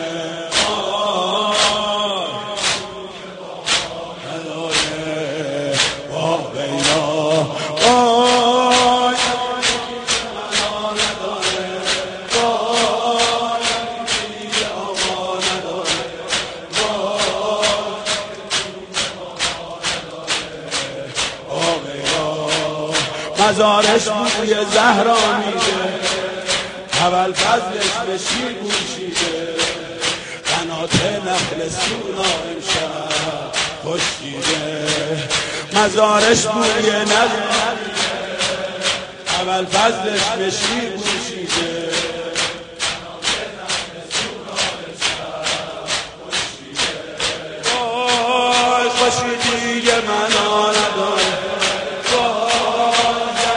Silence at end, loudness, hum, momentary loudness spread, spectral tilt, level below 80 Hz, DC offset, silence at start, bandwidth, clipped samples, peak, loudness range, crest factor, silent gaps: 0 s; -18 LUFS; none; 8 LU; -2 dB/octave; -48 dBFS; under 0.1%; 0 s; 10.5 kHz; under 0.1%; 0 dBFS; 6 LU; 18 dB; none